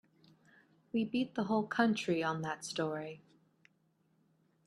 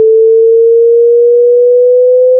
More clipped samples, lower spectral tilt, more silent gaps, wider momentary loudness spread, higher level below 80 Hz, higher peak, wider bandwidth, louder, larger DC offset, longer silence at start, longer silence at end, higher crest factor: neither; second, -5 dB/octave vs -7 dB/octave; neither; first, 10 LU vs 0 LU; first, -78 dBFS vs -86 dBFS; second, -16 dBFS vs -2 dBFS; first, 12 kHz vs 0.7 kHz; second, -35 LUFS vs -6 LUFS; neither; first, 0.95 s vs 0 s; first, 1.5 s vs 0 s; first, 22 dB vs 4 dB